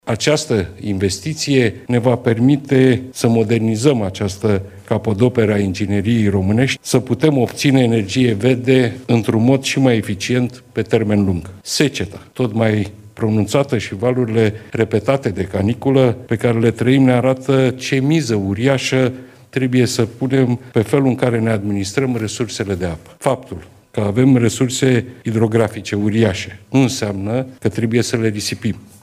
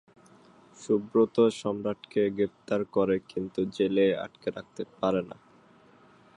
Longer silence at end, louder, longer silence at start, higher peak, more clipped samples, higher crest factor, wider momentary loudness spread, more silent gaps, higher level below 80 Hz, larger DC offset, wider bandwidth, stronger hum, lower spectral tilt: second, 0.2 s vs 1.05 s; first, -17 LUFS vs -28 LUFS; second, 0.05 s vs 0.8 s; first, 0 dBFS vs -10 dBFS; neither; about the same, 16 dB vs 18 dB; second, 8 LU vs 12 LU; neither; first, -50 dBFS vs -66 dBFS; neither; first, 15.5 kHz vs 10.5 kHz; neither; about the same, -6 dB/octave vs -6.5 dB/octave